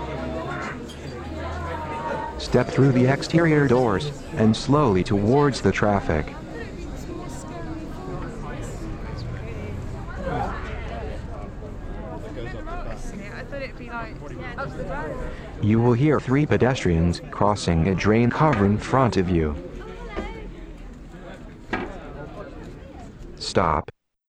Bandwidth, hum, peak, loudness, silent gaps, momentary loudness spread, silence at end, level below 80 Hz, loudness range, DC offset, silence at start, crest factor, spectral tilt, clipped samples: 10 kHz; none; -4 dBFS; -24 LUFS; none; 18 LU; 0.45 s; -38 dBFS; 14 LU; under 0.1%; 0 s; 18 dB; -7 dB/octave; under 0.1%